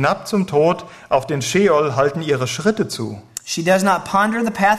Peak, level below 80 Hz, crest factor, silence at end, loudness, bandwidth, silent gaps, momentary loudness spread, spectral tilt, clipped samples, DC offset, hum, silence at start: -4 dBFS; -54 dBFS; 14 dB; 0 s; -18 LUFS; 14 kHz; none; 9 LU; -5 dB/octave; under 0.1%; under 0.1%; none; 0 s